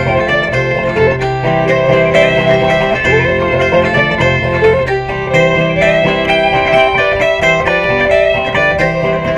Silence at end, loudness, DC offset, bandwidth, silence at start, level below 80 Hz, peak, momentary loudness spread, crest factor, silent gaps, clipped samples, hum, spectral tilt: 0 s; -11 LUFS; under 0.1%; 11 kHz; 0 s; -32 dBFS; 0 dBFS; 4 LU; 12 dB; none; under 0.1%; none; -6 dB/octave